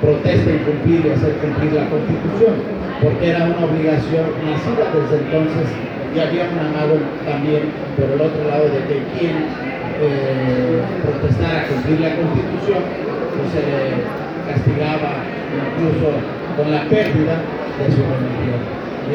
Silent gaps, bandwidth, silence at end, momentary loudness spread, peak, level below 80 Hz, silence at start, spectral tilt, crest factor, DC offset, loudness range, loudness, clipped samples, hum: none; 7 kHz; 0 s; 7 LU; 0 dBFS; -42 dBFS; 0 s; -8.5 dB/octave; 16 dB; under 0.1%; 3 LU; -18 LUFS; under 0.1%; none